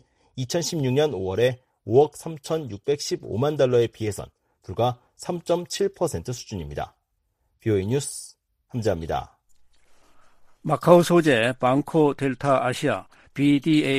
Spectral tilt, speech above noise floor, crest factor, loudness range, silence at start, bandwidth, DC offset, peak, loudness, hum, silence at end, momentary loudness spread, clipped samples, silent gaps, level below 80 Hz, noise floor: -5.5 dB/octave; 50 dB; 24 dB; 8 LU; 0.35 s; 15.5 kHz; under 0.1%; 0 dBFS; -23 LUFS; none; 0 s; 16 LU; under 0.1%; none; -52 dBFS; -72 dBFS